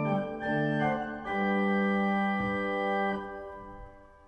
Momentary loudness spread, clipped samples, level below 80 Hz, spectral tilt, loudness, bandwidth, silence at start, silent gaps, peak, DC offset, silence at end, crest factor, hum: 15 LU; under 0.1%; -56 dBFS; -8 dB/octave; -29 LUFS; 8.4 kHz; 0 s; none; -16 dBFS; under 0.1%; 0.2 s; 14 dB; none